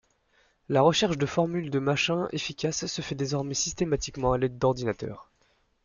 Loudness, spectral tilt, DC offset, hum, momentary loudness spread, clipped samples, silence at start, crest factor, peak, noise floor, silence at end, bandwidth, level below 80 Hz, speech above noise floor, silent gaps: -27 LUFS; -4.5 dB/octave; under 0.1%; none; 9 LU; under 0.1%; 0.7 s; 20 dB; -8 dBFS; -68 dBFS; 0.6 s; 7.4 kHz; -50 dBFS; 41 dB; none